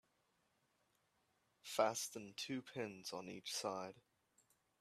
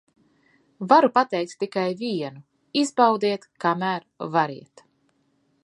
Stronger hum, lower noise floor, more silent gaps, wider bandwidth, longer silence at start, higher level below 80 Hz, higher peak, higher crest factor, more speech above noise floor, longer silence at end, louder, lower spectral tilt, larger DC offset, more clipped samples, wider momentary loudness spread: neither; first, -82 dBFS vs -67 dBFS; neither; first, 15.5 kHz vs 11.5 kHz; first, 1.65 s vs 0.8 s; second, -90 dBFS vs -78 dBFS; second, -22 dBFS vs -2 dBFS; about the same, 26 dB vs 22 dB; second, 37 dB vs 45 dB; second, 0.8 s vs 1 s; second, -44 LUFS vs -23 LUFS; second, -2.5 dB/octave vs -5 dB/octave; neither; neither; about the same, 11 LU vs 13 LU